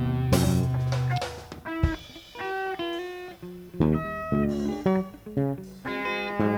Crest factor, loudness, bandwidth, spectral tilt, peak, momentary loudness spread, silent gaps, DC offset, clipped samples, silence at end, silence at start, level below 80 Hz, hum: 20 dB; -28 LUFS; 17.5 kHz; -6.5 dB/octave; -6 dBFS; 13 LU; none; under 0.1%; under 0.1%; 0 s; 0 s; -40 dBFS; none